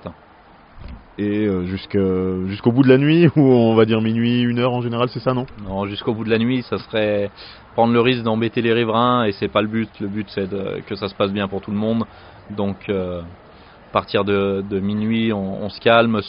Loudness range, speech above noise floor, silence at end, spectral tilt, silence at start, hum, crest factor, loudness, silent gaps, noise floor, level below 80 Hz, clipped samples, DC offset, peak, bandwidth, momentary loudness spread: 8 LU; 29 dB; 0 s; -5.5 dB/octave; 0.05 s; none; 18 dB; -19 LUFS; none; -47 dBFS; -50 dBFS; under 0.1%; under 0.1%; 0 dBFS; 5.4 kHz; 13 LU